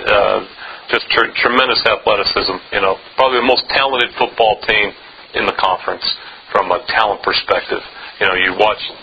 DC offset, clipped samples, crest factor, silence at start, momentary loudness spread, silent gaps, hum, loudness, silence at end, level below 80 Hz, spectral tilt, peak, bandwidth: under 0.1%; under 0.1%; 16 dB; 0 s; 7 LU; none; none; -15 LUFS; 0 s; -46 dBFS; -5 dB/octave; 0 dBFS; 8 kHz